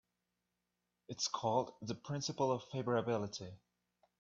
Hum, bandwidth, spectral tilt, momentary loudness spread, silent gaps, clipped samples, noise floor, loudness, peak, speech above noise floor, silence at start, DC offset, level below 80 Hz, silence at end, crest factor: 60 Hz at -65 dBFS; 8 kHz; -4.5 dB/octave; 11 LU; none; under 0.1%; -88 dBFS; -39 LUFS; -20 dBFS; 49 dB; 1.1 s; under 0.1%; -78 dBFS; 0.65 s; 20 dB